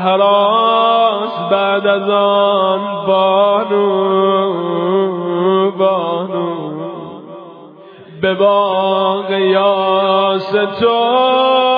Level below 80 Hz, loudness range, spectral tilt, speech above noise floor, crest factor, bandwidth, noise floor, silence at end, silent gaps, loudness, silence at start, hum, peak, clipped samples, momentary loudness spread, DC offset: -64 dBFS; 5 LU; -8.5 dB/octave; 24 dB; 12 dB; 5.2 kHz; -37 dBFS; 0 s; none; -13 LUFS; 0 s; none; 0 dBFS; under 0.1%; 8 LU; under 0.1%